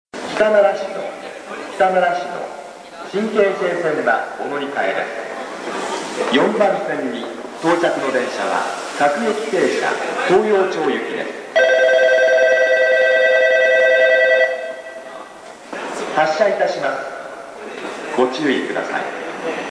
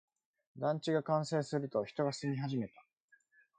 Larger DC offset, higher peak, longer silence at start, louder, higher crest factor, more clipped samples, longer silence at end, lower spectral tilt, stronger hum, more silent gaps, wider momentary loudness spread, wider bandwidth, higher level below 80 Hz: neither; first, -2 dBFS vs -20 dBFS; second, 0.15 s vs 0.55 s; first, -17 LUFS vs -36 LUFS; about the same, 14 dB vs 18 dB; neither; second, 0 s vs 0.9 s; second, -4 dB/octave vs -6.5 dB/octave; neither; neither; first, 17 LU vs 6 LU; first, 11 kHz vs 9.4 kHz; first, -64 dBFS vs -78 dBFS